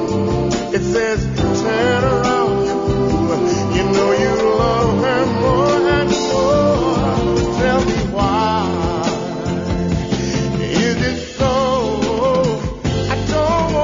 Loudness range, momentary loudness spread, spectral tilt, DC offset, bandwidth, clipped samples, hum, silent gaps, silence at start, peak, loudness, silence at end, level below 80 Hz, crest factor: 3 LU; 5 LU; -5 dB/octave; under 0.1%; 7.6 kHz; under 0.1%; none; none; 0 s; -2 dBFS; -17 LUFS; 0 s; -30 dBFS; 14 dB